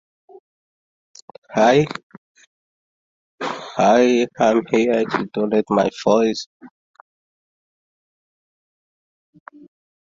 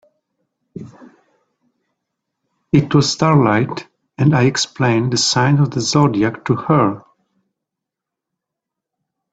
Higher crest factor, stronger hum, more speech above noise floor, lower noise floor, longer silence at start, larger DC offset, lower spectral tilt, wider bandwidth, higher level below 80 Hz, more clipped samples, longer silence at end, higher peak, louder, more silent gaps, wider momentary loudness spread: about the same, 20 dB vs 18 dB; neither; first, over 73 dB vs 68 dB; first, under -90 dBFS vs -83 dBFS; first, 1.5 s vs 0.75 s; neither; about the same, -5.5 dB/octave vs -5.5 dB/octave; second, 7.8 kHz vs 9 kHz; second, -62 dBFS vs -54 dBFS; neither; first, 3.4 s vs 2.35 s; about the same, -2 dBFS vs 0 dBFS; second, -18 LUFS vs -15 LUFS; first, 2.03-2.10 s, 2.18-2.35 s, 2.47-3.38 s, 6.46-6.60 s vs none; about the same, 13 LU vs 12 LU